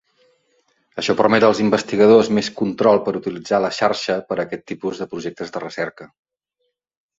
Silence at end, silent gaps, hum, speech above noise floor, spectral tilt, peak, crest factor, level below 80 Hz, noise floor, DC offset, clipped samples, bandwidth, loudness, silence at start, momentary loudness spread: 1.15 s; none; none; 56 dB; -5.5 dB/octave; 0 dBFS; 18 dB; -60 dBFS; -74 dBFS; under 0.1%; under 0.1%; 7.8 kHz; -19 LUFS; 0.95 s; 14 LU